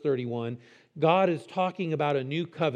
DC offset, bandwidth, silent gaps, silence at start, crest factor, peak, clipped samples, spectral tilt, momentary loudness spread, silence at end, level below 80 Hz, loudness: under 0.1%; 9.8 kHz; none; 0.05 s; 20 dB; -8 dBFS; under 0.1%; -7.5 dB/octave; 11 LU; 0 s; -82 dBFS; -28 LUFS